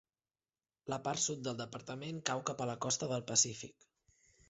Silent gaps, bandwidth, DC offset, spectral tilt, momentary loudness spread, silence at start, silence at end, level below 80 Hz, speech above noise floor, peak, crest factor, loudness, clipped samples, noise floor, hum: none; 8 kHz; under 0.1%; -3.5 dB/octave; 13 LU; 0.85 s; 0.8 s; -74 dBFS; over 52 dB; -16 dBFS; 24 dB; -36 LUFS; under 0.1%; under -90 dBFS; none